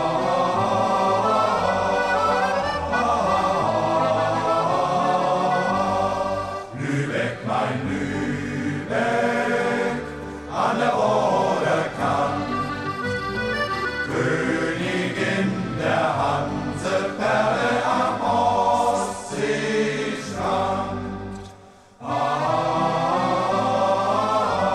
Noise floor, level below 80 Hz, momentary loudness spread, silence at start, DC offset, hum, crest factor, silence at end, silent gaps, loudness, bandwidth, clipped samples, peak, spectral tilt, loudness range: -47 dBFS; -48 dBFS; 7 LU; 0 s; under 0.1%; none; 14 dB; 0 s; none; -22 LUFS; 13 kHz; under 0.1%; -8 dBFS; -5.5 dB/octave; 4 LU